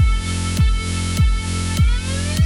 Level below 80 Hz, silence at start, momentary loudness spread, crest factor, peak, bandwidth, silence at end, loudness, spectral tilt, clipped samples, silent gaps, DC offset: -20 dBFS; 0 s; 3 LU; 12 dB; -6 dBFS; 16.5 kHz; 0 s; -20 LUFS; -4.5 dB/octave; under 0.1%; none; under 0.1%